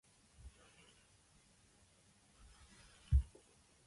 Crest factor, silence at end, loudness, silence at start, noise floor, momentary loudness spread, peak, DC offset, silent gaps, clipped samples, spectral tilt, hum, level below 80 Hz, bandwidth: 24 dB; 0.65 s; -39 LUFS; 0.45 s; -70 dBFS; 28 LU; -22 dBFS; under 0.1%; none; under 0.1%; -6 dB/octave; none; -46 dBFS; 11.5 kHz